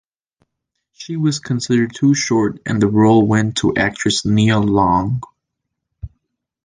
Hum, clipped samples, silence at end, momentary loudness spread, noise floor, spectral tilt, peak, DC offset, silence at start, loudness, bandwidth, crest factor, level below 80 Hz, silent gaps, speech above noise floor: none; under 0.1%; 0.6 s; 17 LU; -78 dBFS; -5.5 dB/octave; -2 dBFS; under 0.1%; 1 s; -16 LUFS; 9.8 kHz; 16 dB; -44 dBFS; none; 62 dB